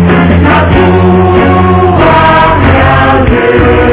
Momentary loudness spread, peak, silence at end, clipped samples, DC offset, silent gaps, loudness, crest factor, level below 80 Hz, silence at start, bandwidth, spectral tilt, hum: 2 LU; 0 dBFS; 0 s; 6%; under 0.1%; none; -5 LUFS; 4 dB; -14 dBFS; 0 s; 4 kHz; -11 dB/octave; none